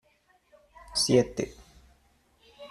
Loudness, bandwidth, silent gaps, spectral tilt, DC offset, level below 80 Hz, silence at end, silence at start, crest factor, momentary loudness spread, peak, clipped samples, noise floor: -27 LUFS; 14 kHz; none; -4 dB/octave; under 0.1%; -56 dBFS; 0.05 s; 0.9 s; 22 dB; 16 LU; -10 dBFS; under 0.1%; -67 dBFS